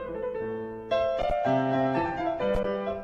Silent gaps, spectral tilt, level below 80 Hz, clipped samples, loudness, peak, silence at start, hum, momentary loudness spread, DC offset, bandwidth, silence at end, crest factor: none; -7.5 dB/octave; -44 dBFS; under 0.1%; -28 LUFS; -14 dBFS; 0 s; none; 8 LU; under 0.1%; 7.4 kHz; 0 s; 14 dB